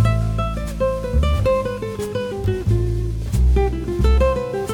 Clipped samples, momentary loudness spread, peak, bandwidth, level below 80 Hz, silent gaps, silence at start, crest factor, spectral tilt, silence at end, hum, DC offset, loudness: under 0.1%; 7 LU; -6 dBFS; 13 kHz; -22 dBFS; none; 0 s; 14 dB; -7.5 dB/octave; 0 s; none; under 0.1%; -21 LUFS